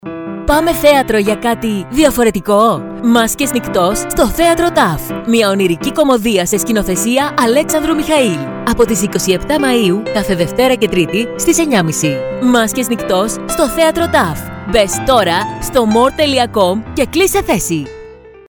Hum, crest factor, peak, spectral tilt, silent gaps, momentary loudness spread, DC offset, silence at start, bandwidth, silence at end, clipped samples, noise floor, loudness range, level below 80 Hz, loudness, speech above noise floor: none; 12 dB; 0 dBFS; -4 dB/octave; none; 5 LU; under 0.1%; 0.05 s; 19.5 kHz; 0.2 s; under 0.1%; -35 dBFS; 1 LU; -32 dBFS; -13 LUFS; 22 dB